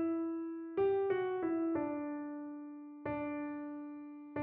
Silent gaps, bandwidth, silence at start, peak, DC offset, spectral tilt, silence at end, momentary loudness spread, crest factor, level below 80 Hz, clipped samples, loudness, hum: none; 3.8 kHz; 0 s; -24 dBFS; under 0.1%; -6.5 dB/octave; 0 s; 13 LU; 14 dB; -72 dBFS; under 0.1%; -38 LUFS; none